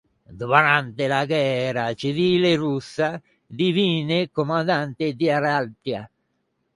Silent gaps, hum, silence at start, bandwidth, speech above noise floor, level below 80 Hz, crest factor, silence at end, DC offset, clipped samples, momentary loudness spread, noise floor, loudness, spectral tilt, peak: none; none; 0.3 s; 11.5 kHz; 51 dB; -62 dBFS; 22 dB; 0.7 s; under 0.1%; under 0.1%; 11 LU; -72 dBFS; -22 LUFS; -6 dB/octave; -2 dBFS